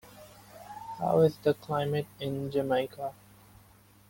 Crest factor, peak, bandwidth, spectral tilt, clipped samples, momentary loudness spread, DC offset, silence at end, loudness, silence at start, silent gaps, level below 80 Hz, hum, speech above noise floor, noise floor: 20 dB; -12 dBFS; 17 kHz; -7 dB/octave; under 0.1%; 25 LU; under 0.1%; 1 s; -30 LUFS; 0.05 s; none; -64 dBFS; none; 30 dB; -59 dBFS